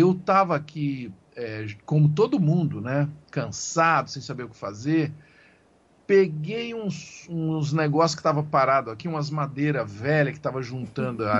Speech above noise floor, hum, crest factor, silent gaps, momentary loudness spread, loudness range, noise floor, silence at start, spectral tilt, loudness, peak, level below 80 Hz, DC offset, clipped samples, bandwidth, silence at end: 35 dB; none; 18 dB; none; 13 LU; 3 LU; -60 dBFS; 0 s; -6.5 dB/octave; -25 LUFS; -6 dBFS; -62 dBFS; under 0.1%; under 0.1%; 7.8 kHz; 0 s